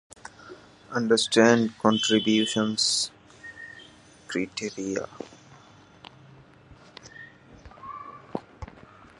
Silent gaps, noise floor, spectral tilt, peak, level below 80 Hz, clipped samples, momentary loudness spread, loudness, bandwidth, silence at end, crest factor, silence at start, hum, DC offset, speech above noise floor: none; -53 dBFS; -3.5 dB/octave; -4 dBFS; -58 dBFS; under 0.1%; 25 LU; -24 LUFS; 11.5 kHz; 0.55 s; 24 dB; 0.45 s; none; under 0.1%; 29 dB